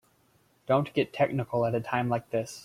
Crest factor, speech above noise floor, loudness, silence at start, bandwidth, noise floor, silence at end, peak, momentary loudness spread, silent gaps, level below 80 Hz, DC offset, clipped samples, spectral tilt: 20 dB; 38 dB; -28 LUFS; 0.7 s; 16 kHz; -66 dBFS; 0 s; -10 dBFS; 4 LU; none; -64 dBFS; under 0.1%; under 0.1%; -6.5 dB/octave